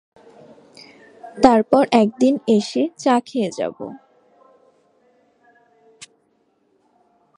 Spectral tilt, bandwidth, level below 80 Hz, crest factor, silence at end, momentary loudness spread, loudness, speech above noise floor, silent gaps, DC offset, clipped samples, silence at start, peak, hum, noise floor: -5.5 dB/octave; 11 kHz; -58 dBFS; 22 dB; 3.4 s; 14 LU; -18 LUFS; 47 dB; none; under 0.1%; under 0.1%; 1.25 s; 0 dBFS; none; -64 dBFS